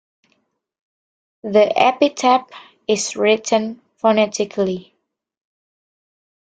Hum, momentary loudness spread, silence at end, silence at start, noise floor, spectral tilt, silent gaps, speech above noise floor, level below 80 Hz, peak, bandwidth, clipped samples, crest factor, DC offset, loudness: none; 11 LU; 1.7 s; 1.45 s; -72 dBFS; -3.5 dB/octave; none; 55 dB; -66 dBFS; 0 dBFS; 9.4 kHz; under 0.1%; 20 dB; under 0.1%; -17 LUFS